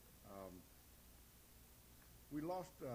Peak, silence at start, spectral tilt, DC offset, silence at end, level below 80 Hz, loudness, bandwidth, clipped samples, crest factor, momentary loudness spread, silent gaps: -34 dBFS; 0 s; -6 dB/octave; under 0.1%; 0 s; -70 dBFS; -51 LUFS; over 20 kHz; under 0.1%; 18 dB; 17 LU; none